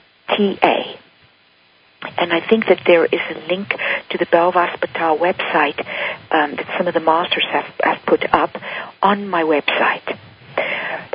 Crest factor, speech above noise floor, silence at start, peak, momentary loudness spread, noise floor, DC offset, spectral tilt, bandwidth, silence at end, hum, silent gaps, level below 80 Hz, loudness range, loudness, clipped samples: 18 dB; 36 dB; 0.3 s; 0 dBFS; 9 LU; -54 dBFS; under 0.1%; -8 dB/octave; 5.2 kHz; 0.05 s; none; none; -58 dBFS; 2 LU; -18 LUFS; under 0.1%